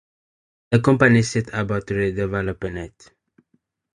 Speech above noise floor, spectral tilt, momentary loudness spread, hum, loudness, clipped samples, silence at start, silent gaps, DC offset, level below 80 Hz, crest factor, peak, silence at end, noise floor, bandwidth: 48 dB; -6.5 dB/octave; 15 LU; none; -20 LUFS; under 0.1%; 0.7 s; none; under 0.1%; -46 dBFS; 20 dB; -2 dBFS; 1.05 s; -68 dBFS; 11 kHz